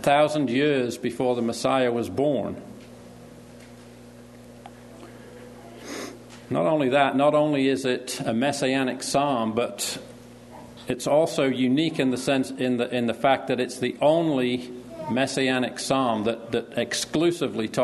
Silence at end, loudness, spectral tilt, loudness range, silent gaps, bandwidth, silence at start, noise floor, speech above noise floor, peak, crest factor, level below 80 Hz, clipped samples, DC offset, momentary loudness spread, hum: 0 s; -24 LUFS; -4.5 dB/octave; 10 LU; none; 12.5 kHz; 0 s; -46 dBFS; 22 dB; -6 dBFS; 20 dB; -62 dBFS; under 0.1%; under 0.1%; 23 LU; 60 Hz at -50 dBFS